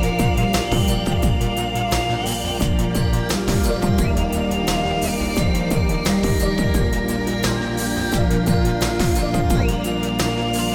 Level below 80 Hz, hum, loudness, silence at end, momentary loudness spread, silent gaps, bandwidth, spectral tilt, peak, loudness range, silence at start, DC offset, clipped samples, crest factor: -24 dBFS; none; -20 LUFS; 0 s; 3 LU; none; 18 kHz; -5.5 dB/octave; -6 dBFS; 1 LU; 0 s; under 0.1%; under 0.1%; 14 dB